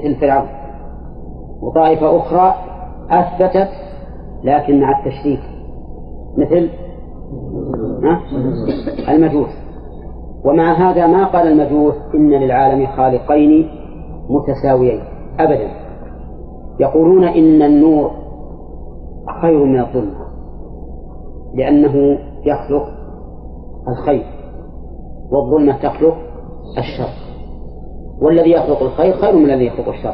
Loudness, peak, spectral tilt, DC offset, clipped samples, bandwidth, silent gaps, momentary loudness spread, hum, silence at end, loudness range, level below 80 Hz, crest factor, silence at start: -14 LUFS; -2 dBFS; -11.5 dB/octave; under 0.1%; under 0.1%; 5.2 kHz; none; 23 LU; none; 0 s; 6 LU; -32 dBFS; 14 dB; 0 s